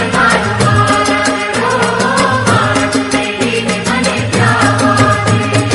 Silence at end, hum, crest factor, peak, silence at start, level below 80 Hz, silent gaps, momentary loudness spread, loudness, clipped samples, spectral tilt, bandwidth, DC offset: 0 s; none; 12 dB; 0 dBFS; 0 s; -36 dBFS; none; 4 LU; -11 LUFS; under 0.1%; -4.5 dB/octave; 11.5 kHz; under 0.1%